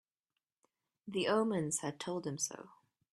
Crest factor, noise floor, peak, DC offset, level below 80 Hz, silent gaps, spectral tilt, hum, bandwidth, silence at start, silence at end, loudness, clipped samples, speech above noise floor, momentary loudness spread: 20 dB; under -90 dBFS; -20 dBFS; under 0.1%; -80 dBFS; none; -4 dB/octave; none; 14.5 kHz; 1.05 s; 0.45 s; -36 LUFS; under 0.1%; over 54 dB; 12 LU